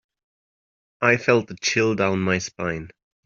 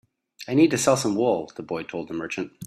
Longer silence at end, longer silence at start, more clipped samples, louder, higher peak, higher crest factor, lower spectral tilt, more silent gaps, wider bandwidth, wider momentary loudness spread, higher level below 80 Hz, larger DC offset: first, 0.35 s vs 0 s; first, 1 s vs 0.4 s; neither; first, -21 LUFS vs -24 LUFS; about the same, -4 dBFS vs -6 dBFS; about the same, 20 dB vs 18 dB; about the same, -4.5 dB/octave vs -5 dB/octave; neither; second, 7.6 kHz vs 14.5 kHz; second, 10 LU vs 13 LU; first, -58 dBFS vs -64 dBFS; neither